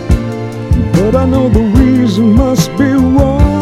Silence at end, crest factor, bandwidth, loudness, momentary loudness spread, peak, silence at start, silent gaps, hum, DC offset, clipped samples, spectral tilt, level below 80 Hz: 0 s; 10 dB; 15 kHz; -10 LUFS; 6 LU; 0 dBFS; 0 s; none; none; under 0.1%; 0.7%; -7.5 dB/octave; -18 dBFS